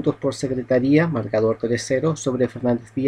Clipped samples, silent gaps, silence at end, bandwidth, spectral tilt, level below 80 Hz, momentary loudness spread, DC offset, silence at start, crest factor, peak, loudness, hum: under 0.1%; none; 0 s; 11 kHz; -6.5 dB/octave; -52 dBFS; 6 LU; under 0.1%; 0 s; 16 dB; -4 dBFS; -21 LUFS; none